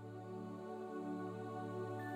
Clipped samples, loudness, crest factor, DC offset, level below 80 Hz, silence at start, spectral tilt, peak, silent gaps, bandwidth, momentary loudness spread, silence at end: under 0.1%; -46 LUFS; 12 dB; under 0.1%; -86 dBFS; 0 s; -8 dB/octave; -34 dBFS; none; 15 kHz; 4 LU; 0 s